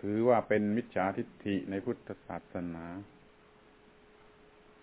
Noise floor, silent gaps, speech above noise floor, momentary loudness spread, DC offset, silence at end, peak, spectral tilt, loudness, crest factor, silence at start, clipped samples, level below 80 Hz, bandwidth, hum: -61 dBFS; none; 28 dB; 16 LU; under 0.1%; 1.75 s; -14 dBFS; -6.5 dB/octave; -33 LUFS; 20 dB; 0.05 s; under 0.1%; -64 dBFS; 4 kHz; none